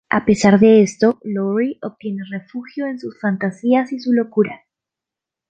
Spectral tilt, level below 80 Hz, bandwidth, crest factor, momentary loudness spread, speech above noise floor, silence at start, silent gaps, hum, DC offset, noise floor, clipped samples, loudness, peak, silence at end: -6.5 dB/octave; -56 dBFS; 8.8 kHz; 16 dB; 16 LU; 70 dB; 0.1 s; none; none; under 0.1%; -86 dBFS; under 0.1%; -17 LUFS; -2 dBFS; 0.95 s